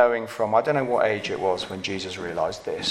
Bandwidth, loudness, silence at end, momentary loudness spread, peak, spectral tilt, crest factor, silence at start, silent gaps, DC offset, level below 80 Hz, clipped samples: 14 kHz; -25 LUFS; 0 s; 8 LU; -4 dBFS; -4.5 dB/octave; 20 dB; 0 s; none; under 0.1%; -60 dBFS; under 0.1%